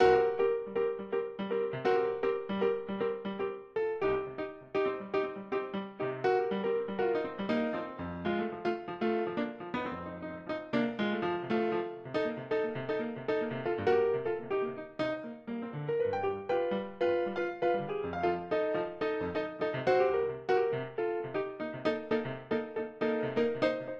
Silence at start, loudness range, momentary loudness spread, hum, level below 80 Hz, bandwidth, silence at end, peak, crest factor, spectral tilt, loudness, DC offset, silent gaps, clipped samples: 0 s; 3 LU; 7 LU; none; -64 dBFS; 7 kHz; 0 s; -14 dBFS; 18 dB; -7.5 dB/octave; -33 LUFS; under 0.1%; none; under 0.1%